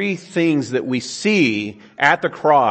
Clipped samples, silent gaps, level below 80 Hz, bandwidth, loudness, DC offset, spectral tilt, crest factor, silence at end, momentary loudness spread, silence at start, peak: under 0.1%; none; -66 dBFS; 8.8 kHz; -18 LUFS; under 0.1%; -5 dB/octave; 18 dB; 0 s; 7 LU; 0 s; 0 dBFS